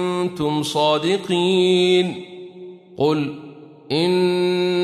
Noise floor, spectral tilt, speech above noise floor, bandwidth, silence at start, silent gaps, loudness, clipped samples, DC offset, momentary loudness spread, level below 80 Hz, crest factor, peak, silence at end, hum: -39 dBFS; -5.5 dB/octave; 21 dB; 13 kHz; 0 s; none; -19 LUFS; under 0.1%; under 0.1%; 21 LU; -62 dBFS; 14 dB; -6 dBFS; 0 s; none